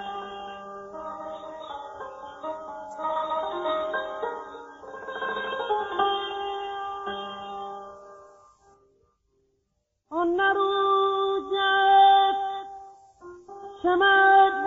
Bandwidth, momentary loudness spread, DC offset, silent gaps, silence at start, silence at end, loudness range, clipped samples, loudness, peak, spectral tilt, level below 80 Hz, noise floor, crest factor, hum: 7.4 kHz; 22 LU; under 0.1%; none; 0 s; 0 s; 14 LU; under 0.1%; -24 LUFS; -8 dBFS; 0.5 dB/octave; -64 dBFS; -76 dBFS; 18 dB; none